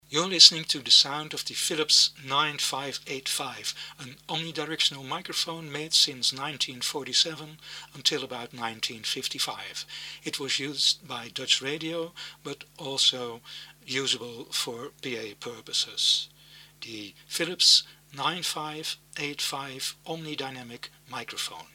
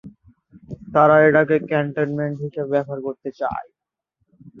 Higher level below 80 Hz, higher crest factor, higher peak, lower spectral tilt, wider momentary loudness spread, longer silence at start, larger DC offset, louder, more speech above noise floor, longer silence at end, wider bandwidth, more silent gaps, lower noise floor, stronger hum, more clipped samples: second, -70 dBFS vs -56 dBFS; first, 28 dB vs 20 dB; about the same, 0 dBFS vs 0 dBFS; second, -1 dB/octave vs -9 dB/octave; first, 20 LU vs 16 LU; about the same, 0.1 s vs 0.05 s; neither; second, -25 LUFS vs -19 LUFS; second, 24 dB vs 55 dB; about the same, 0.1 s vs 0 s; first, 18.5 kHz vs 6 kHz; neither; second, -53 dBFS vs -74 dBFS; first, 50 Hz at -65 dBFS vs none; neither